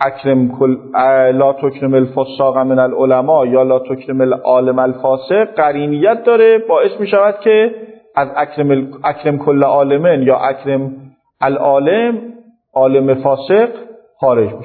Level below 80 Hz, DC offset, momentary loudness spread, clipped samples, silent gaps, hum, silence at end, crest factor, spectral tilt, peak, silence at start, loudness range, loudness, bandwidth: -64 dBFS; under 0.1%; 7 LU; under 0.1%; none; none; 0 s; 12 dB; -10.5 dB/octave; 0 dBFS; 0 s; 2 LU; -13 LUFS; 4.5 kHz